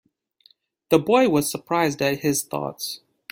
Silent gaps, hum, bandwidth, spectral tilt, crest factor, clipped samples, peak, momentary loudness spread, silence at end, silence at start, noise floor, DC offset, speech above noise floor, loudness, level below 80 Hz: none; none; 16.5 kHz; -4.5 dB/octave; 20 dB; under 0.1%; -2 dBFS; 13 LU; 0.35 s; 0.9 s; -60 dBFS; under 0.1%; 38 dB; -22 LUFS; -62 dBFS